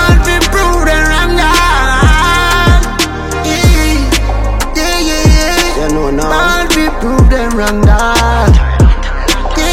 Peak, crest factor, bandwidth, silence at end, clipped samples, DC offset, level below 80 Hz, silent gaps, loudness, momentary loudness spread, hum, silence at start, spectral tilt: 0 dBFS; 8 dB; 16.5 kHz; 0 s; 0.2%; under 0.1%; -12 dBFS; none; -10 LUFS; 5 LU; none; 0 s; -4.5 dB/octave